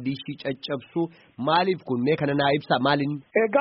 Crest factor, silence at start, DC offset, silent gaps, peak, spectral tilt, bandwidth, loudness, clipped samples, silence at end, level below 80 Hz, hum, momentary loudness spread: 18 dB; 0 s; under 0.1%; none; -6 dBFS; -4 dB/octave; 5.8 kHz; -25 LUFS; under 0.1%; 0 s; -64 dBFS; none; 9 LU